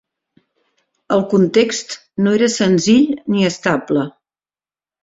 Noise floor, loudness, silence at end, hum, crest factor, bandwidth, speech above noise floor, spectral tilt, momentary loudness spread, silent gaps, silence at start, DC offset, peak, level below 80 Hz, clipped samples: under -90 dBFS; -16 LUFS; 0.95 s; none; 16 dB; 8 kHz; over 75 dB; -5 dB/octave; 7 LU; none; 1.1 s; under 0.1%; -2 dBFS; -58 dBFS; under 0.1%